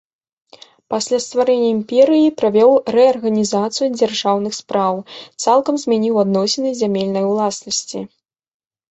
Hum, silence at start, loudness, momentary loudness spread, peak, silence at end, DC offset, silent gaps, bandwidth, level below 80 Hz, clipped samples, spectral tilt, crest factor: none; 0.9 s; -16 LUFS; 9 LU; -2 dBFS; 0.85 s; under 0.1%; none; 8.4 kHz; -62 dBFS; under 0.1%; -4.5 dB/octave; 16 dB